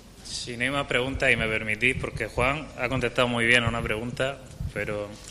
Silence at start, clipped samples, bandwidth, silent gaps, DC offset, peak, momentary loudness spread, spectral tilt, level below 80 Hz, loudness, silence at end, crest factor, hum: 0 s; under 0.1%; 15 kHz; none; under 0.1%; -6 dBFS; 12 LU; -4.5 dB/octave; -42 dBFS; -25 LUFS; 0 s; 22 dB; none